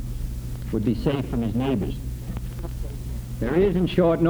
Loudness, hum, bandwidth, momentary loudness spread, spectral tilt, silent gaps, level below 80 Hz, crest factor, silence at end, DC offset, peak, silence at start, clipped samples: -26 LUFS; none; over 20 kHz; 13 LU; -8 dB/octave; none; -34 dBFS; 16 dB; 0 s; under 0.1%; -8 dBFS; 0 s; under 0.1%